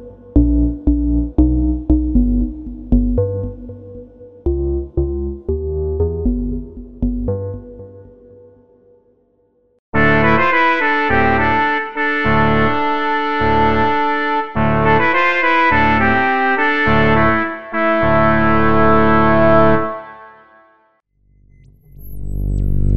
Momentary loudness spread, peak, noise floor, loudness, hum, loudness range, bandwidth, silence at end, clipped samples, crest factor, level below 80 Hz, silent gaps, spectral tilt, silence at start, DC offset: 13 LU; 0 dBFS; -58 dBFS; -15 LUFS; none; 9 LU; 12.5 kHz; 0 s; under 0.1%; 16 dB; -24 dBFS; 9.79-9.92 s; -8.5 dB/octave; 0 s; under 0.1%